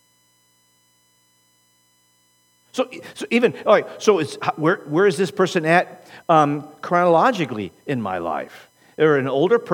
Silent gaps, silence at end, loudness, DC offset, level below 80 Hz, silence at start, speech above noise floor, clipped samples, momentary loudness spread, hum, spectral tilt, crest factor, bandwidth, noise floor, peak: none; 0 s; -20 LUFS; under 0.1%; -72 dBFS; 2.75 s; 42 dB; under 0.1%; 13 LU; 60 Hz at -50 dBFS; -5.5 dB/octave; 20 dB; 18 kHz; -61 dBFS; 0 dBFS